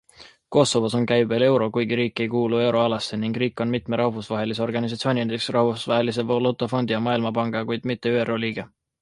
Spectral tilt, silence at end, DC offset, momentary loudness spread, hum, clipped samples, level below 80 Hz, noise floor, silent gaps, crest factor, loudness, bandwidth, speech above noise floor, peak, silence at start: -5.5 dB/octave; 0.35 s; under 0.1%; 7 LU; none; under 0.1%; -60 dBFS; -45 dBFS; none; 20 dB; -23 LUFS; 11.5 kHz; 23 dB; -2 dBFS; 0.2 s